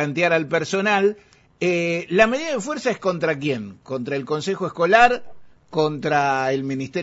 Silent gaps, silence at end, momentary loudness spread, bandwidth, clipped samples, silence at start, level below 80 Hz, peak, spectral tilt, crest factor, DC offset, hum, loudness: none; 0 s; 9 LU; 8 kHz; under 0.1%; 0 s; -56 dBFS; -2 dBFS; -5 dB/octave; 18 dB; under 0.1%; none; -21 LUFS